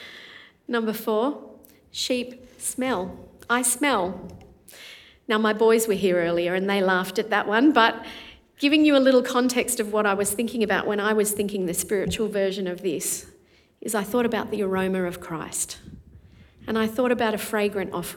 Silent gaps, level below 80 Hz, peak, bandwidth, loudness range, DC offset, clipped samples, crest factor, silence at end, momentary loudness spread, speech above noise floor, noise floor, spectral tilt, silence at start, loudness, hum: none; -58 dBFS; -4 dBFS; 19 kHz; 7 LU; under 0.1%; under 0.1%; 20 dB; 0 s; 18 LU; 34 dB; -57 dBFS; -3.5 dB/octave; 0 s; -23 LUFS; none